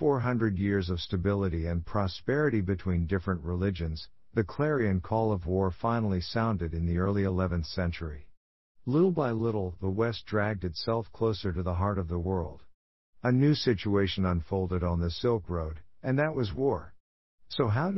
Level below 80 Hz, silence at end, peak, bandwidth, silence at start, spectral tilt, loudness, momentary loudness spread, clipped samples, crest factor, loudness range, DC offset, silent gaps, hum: -46 dBFS; 0 s; -12 dBFS; 6 kHz; 0 s; -6.5 dB/octave; -30 LUFS; 7 LU; under 0.1%; 16 dB; 2 LU; 0.2%; 8.37-8.75 s, 12.74-13.13 s, 17.00-17.38 s; none